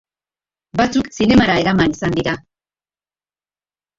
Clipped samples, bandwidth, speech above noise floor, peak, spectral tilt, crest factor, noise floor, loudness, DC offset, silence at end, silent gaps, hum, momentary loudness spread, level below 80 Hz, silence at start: under 0.1%; 7.8 kHz; over 75 dB; -2 dBFS; -5.5 dB/octave; 18 dB; under -90 dBFS; -16 LUFS; under 0.1%; 1.6 s; none; 50 Hz at -45 dBFS; 11 LU; -42 dBFS; 0.75 s